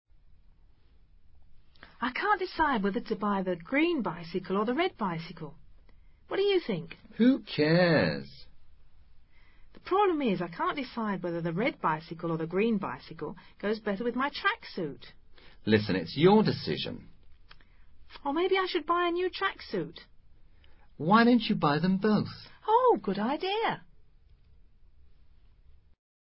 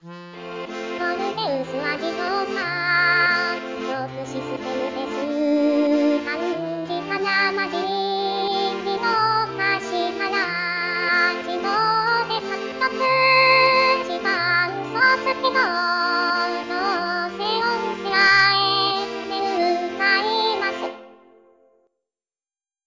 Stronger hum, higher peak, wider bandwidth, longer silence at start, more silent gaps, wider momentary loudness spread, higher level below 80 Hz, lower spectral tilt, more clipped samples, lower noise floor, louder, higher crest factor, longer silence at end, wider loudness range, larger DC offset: neither; second, -10 dBFS vs -6 dBFS; second, 5.8 kHz vs 7.6 kHz; first, 0.3 s vs 0.05 s; neither; first, 15 LU vs 11 LU; first, -58 dBFS vs -64 dBFS; first, -10 dB/octave vs -4 dB/octave; neither; second, -57 dBFS vs under -90 dBFS; second, -29 LUFS vs -20 LUFS; about the same, 20 dB vs 16 dB; second, 1.25 s vs 1.75 s; about the same, 5 LU vs 5 LU; neither